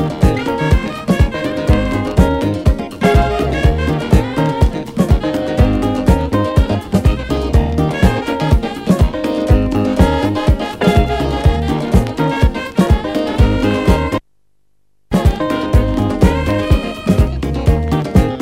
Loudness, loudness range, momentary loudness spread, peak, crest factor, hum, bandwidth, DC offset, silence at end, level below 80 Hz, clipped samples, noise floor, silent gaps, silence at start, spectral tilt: -15 LUFS; 2 LU; 4 LU; 0 dBFS; 14 dB; none; 16 kHz; 0.2%; 0 s; -18 dBFS; under 0.1%; -66 dBFS; none; 0 s; -7.5 dB/octave